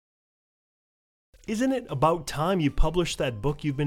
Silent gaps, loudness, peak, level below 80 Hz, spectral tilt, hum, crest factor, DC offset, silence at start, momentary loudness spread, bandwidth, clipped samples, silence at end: none; -27 LUFS; -10 dBFS; -36 dBFS; -6 dB/octave; none; 18 dB; under 0.1%; 1.5 s; 5 LU; 16 kHz; under 0.1%; 0 s